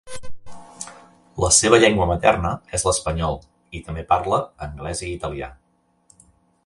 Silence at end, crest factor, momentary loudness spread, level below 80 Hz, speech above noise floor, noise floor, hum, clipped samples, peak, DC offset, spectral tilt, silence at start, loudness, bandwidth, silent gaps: 1.15 s; 22 dB; 22 LU; -38 dBFS; 44 dB; -64 dBFS; none; under 0.1%; 0 dBFS; under 0.1%; -3.5 dB/octave; 0.05 s; -19 LUFS; 11.5 kHz; none